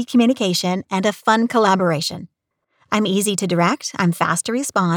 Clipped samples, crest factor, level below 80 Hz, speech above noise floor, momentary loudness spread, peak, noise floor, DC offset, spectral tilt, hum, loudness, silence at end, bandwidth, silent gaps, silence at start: under 0.1%; 16 dB; -66 dBFS; 52 dB; 5 LU; -2 dBFS; -70 dBFS; under 0.1%; -4.5 dB/octave; none; -18 LUFS; 0 s; over 20 kHz; none; 0 s